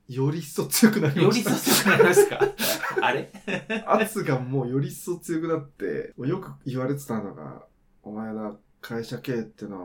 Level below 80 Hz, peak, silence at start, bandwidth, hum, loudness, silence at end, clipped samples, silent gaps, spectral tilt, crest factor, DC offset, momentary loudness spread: -60 dBFS; -4 dBFS; 0.1 s; 19 kHz; none; -24 LUFS; 0 s; under 0.1%; none; -4.5 dB/octave; 22 dB; under 0.1%; 16 LU